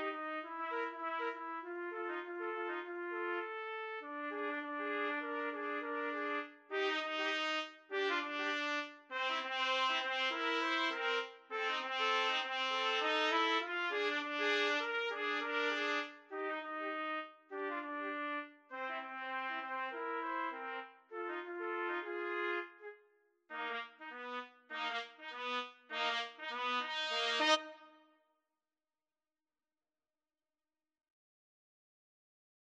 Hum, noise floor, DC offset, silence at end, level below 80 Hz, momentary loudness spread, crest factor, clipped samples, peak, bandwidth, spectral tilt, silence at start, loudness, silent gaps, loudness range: none; under -90 dBFS; under 0.1%; 4.7 s; under -90 dBFS; 11 LU; 22 dB; under 0.1%; -18 dBFS; 9.4 kHz; 0 dB/octave; 0 s; -38 LUFS; none; 7 LU